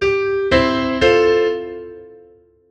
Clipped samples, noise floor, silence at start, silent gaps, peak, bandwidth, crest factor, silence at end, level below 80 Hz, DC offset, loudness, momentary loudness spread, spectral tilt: under 0.1%; -49 dBFS; 0 s; none; 0 dBFS; 8.4 kHz; 18 dB; 0.55 s; -38 dBFS; under 0.1%; -16 LUFS; 18 LU; -5.5 dB/octave